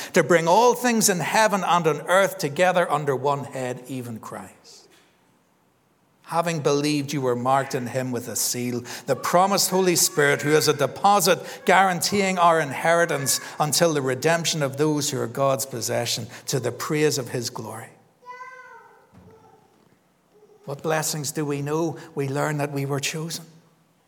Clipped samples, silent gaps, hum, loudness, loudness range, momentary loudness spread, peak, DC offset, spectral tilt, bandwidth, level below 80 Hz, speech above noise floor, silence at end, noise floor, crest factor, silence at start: under 0.1%; none; none; -22 LUFS; 12 LU; 12 LU; -2 dBFS; under 0.1%; -3.5 dB/octave; 19.5 kHz; -74 dBFS; 41 dB; 0.6 s; -63 dBFS; 22 dB; 0 s